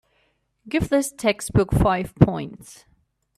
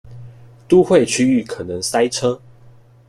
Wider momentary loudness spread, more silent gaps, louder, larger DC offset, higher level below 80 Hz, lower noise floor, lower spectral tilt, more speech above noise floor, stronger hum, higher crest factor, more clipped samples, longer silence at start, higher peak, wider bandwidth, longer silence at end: about the same, 12 LU vs 11 LU; neither; second, -21 LUFS vs -16 LUFS; neither; first, -36 dBFS vs -52 dBFS; first, -67 dBFS vs -46 dBFS; first, -6 dB/octave vs -4.5 dB/octave; first, 46 dB vs 30 dB; neither; about the same, 22 dB vs 18 dB; neither; first, 0.65 s vs 0.05 s; about the same, 0 dBFS vs -2 dBFS; about the same, 15 kHz vs 14 kHz; about the same, 0.65 s vs 0.7 s